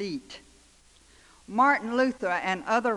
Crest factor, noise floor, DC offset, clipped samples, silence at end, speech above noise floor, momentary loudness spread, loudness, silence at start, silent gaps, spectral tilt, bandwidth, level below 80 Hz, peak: 18 dB; -58 dBFS; under 0.1%; under 0.1%; 0 s; 32 dB; 18 LU; -26 LUFS; 0 s; none; -4.5 dB/octave; 11.5 kHz; -62 dBFS; -10 dBFS